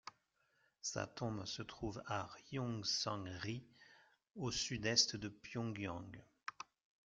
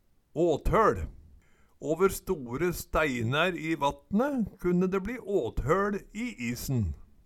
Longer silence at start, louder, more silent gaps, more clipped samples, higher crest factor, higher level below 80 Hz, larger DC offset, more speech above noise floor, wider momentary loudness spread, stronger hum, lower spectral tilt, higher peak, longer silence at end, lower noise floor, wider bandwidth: second, 0.05 s vs 0.35 s; second, -42 LUFS vs -29 LUFS; neither; neither; first, 26 dB vs 18 dB; second, -68 dBFS vs -44 dBFS; neither; first, 37 dB vs 30 dB; first, 17 LU vs 9 LU; neither; second, -3 dB/octave vs -6 dB/octave; second, -18 dBFS vs -12 dBFS; about the same, 0.4 s vs 0.3 s; first, -80 dBFS vs -59 dBFS; second, 11 kHz vs 17.5 kHz